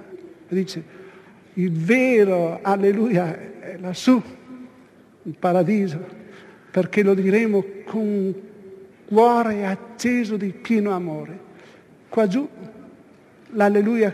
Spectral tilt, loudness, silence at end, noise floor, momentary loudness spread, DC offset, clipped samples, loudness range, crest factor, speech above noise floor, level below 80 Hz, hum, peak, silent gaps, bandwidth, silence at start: -7 dB/octave; -21 LUFS; 0 s; -50 dBFS; 22 LU; under 0.1%; under 0.1%; 4 LU; 18 dB; 30 dB; -70 dBFS; none; -4 dBFS; none; 14 kHz; 0 s